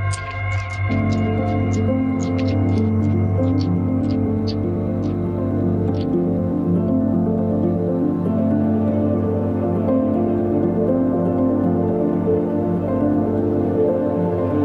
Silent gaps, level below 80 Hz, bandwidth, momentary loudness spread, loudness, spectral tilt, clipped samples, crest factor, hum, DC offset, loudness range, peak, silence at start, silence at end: none; -42 dBFS; 9.8 kHz; 3 LU; -20 LUFS; -9 dB/octave; under 0.1%; 12 dB; none; under 0.1%; 1 LU; -8 dBFS; 0 s; 0 s